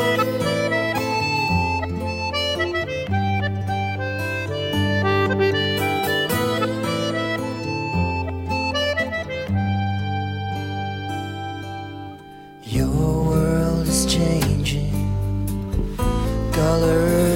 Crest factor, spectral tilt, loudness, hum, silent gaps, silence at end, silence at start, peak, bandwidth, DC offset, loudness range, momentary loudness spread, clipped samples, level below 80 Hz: 16 dB; -5 dB/octave; -22 LUFS; none; none; 0 s; 0 s; -6 dBFS; 16.5 kHz; under 0.1%; 4 LU; 8 LU; under 0.1%; -34 dBFS